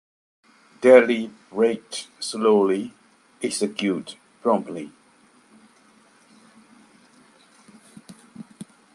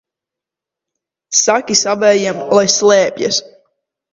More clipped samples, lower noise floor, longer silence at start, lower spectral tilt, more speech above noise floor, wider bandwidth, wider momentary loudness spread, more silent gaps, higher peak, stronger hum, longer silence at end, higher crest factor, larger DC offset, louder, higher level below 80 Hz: neither; second, -57 dBFS vs -85 dBFS; second, 0.8 s vs 1.3 s; first, -4.5 dB/octave vs -2 dB/octave; second, 36 dB vs 72 dB; first, 12.5 kHz vs 8 kHz; first, 27 LU vs 6 LU; neither; about the same, -2 dBFS vs 0 dBFS; neither; second, 0.3 s vs 0.7 s; first, 22 dB vs 16 dB; neither; second, -21 LUFS vs -13 LUFS; second, -72 dBFS vs -60 dBFS